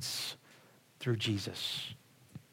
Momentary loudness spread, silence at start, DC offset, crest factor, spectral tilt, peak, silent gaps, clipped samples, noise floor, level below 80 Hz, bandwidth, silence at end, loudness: 21 LU; 0 s; under 0.1%; 20 dB; -4 dB/octave; -20 dBFS; none; under 0.1%; -62 dBFS; -80 dBFS; 16.5 kHz; 0.1 s; -37 LUFS